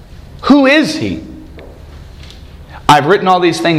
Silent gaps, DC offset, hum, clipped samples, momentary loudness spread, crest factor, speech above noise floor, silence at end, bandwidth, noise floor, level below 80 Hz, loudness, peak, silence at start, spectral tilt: none; under 0.1%; none; 0.3%; 17 LU; 12 dB; 23 dB; 0 s; 14.5 kHz; -33 dBFS; -36 dBFS; -11 LUFS; 0 dBFS; 0.4 s; -5 dB/octave